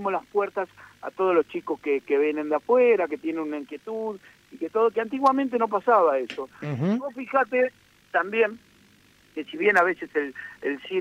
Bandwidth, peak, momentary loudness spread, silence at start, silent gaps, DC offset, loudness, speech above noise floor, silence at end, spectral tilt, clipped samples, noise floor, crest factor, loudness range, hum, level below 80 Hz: 10.5 kHz; -6 dBFS; 14 LU; 0 s; none; under 0.1%; -25 LUFS; 33 dB; 0 s; -7 dB/octave; under 0.1%; -58 dBFS; 20 dB; 2 LU; none; -72 dBFS